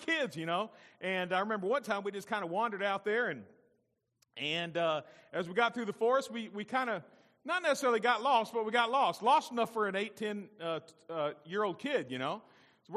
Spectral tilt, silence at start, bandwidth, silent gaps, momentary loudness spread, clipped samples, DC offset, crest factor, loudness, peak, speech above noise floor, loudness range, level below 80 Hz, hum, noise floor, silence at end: -4 dB/octave; 0 s; 14.5 kHz; none; 11 LU; under 0.1%; under 0.1%; 20 dB; -33 LUFS; -14 dBFS; 44 dB; 5 LU; -86 dBFS; none; -78 dBFS; 0 s